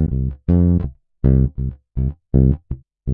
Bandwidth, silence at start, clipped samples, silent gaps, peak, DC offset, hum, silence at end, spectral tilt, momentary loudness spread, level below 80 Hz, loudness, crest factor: 2.1 kHz; 0 s; under 0.1%; none; -2 dBFS; under 0.1%; none; 0 s; -14 dB/octave; 12 LU; -24 dBFS; -19 LUFS; 14 dB